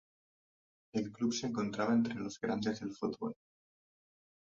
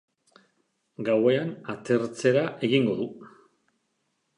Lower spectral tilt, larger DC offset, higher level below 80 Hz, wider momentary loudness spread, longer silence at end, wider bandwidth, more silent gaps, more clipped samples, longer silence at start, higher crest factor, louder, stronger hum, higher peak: about the same, -5 dB/octave vs -6 dB/octave; neither; about the same, -74 dBFS vs -74 dBFS; about the same, 10 LU vs 11 LU; about the same, 1.05 s vs 1.1 s; second, 7.6 kHz vs 11 kHz; neither; neither; about the same, 0.95 s vs 1 s; about the same, 18 dB vs 20 dB; second, -36 LUFS vs -26 LUFS; neither; second, -20 dBFS vs -8 dBFS